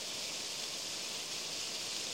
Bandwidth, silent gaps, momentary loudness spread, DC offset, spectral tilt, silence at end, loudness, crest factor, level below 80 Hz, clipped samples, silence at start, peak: 16 kHz; none; 1 LU; under 0.1%; 0.5 dB/octave; 0 s; -38 LUFS; 16 dB; -76 dBFS; under 0.1%; 0 s; -24 dBFS